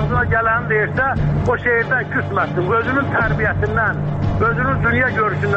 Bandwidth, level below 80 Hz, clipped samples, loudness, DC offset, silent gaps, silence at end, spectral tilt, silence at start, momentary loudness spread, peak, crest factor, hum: 7.2 kHz; -32 dBFS; under 0.1%; -17 LUFS; under 0.1%; none; 0 s; -8.5 dB/octave; 0 s; 3 LU; -6 dBFS; 12 dB; none